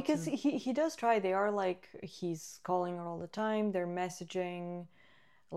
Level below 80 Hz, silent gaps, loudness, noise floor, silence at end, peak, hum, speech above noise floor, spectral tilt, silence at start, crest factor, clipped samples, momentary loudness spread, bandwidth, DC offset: -78 dBFS; none; -35 LUFS; -67 dBFS; 0 s; -18 dBFS; none; 32 dB; -5.5 dB/octave; 0 s; 18 dB; under 0.1%; 12 LU; 14.5 kHz; under 0.1%